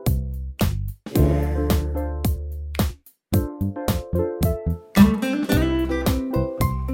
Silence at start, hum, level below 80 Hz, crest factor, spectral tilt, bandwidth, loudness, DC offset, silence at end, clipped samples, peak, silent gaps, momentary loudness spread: 0 s; none; -28 dBFS; 20 dB; -6.5 dB/octave; 17 kHz; -23 LUFS; under 0.1%; 0 s; under 0.1%; -2 dBFS; none; 10 LU